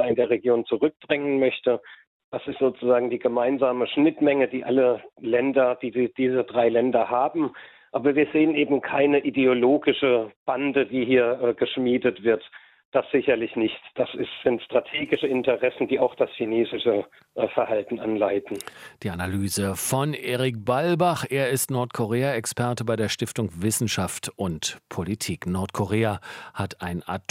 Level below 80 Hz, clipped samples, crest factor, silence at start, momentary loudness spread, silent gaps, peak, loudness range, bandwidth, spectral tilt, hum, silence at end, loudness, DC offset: -64 dBFS; under 0.1%; 18 dB; 0 s; 9 LU; 2.07-2.32 s, 10.36-10.46 s, 12.85-12.92 s; -6 dBFS; 5 LU; 16.5 kHz; -5 dB/octave; none; 0.1 s; -24 LUFS; under 0.1%